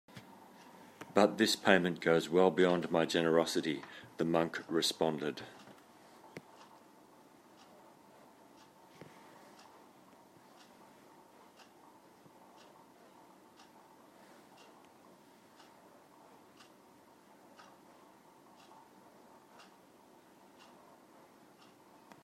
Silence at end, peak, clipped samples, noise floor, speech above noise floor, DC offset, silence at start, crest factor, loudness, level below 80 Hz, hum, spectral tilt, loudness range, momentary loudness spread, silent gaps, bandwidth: 15.85 s; -10 dBFS; under 0.1%; -62 dBFS; 31 dB; under 0.1%; 0.15 s; 28 dB; -32 LUFS; -80 dBFS; none; -4.5 dB/octave; 28 LU; 29 LU; none; 16 kHz